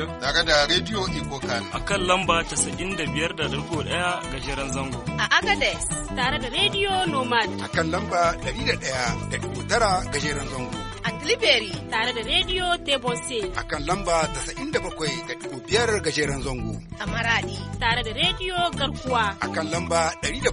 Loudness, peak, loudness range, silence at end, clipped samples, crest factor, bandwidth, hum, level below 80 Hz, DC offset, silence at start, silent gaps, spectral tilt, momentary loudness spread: -24 LUFS; -4 dBFS; 3 LU; 0 s; under 0.1%; 20 dB; 10.5 kHz; none; -40 dBFS; under 0.1%; 0 s; none; -3 dB/octave; 9 LU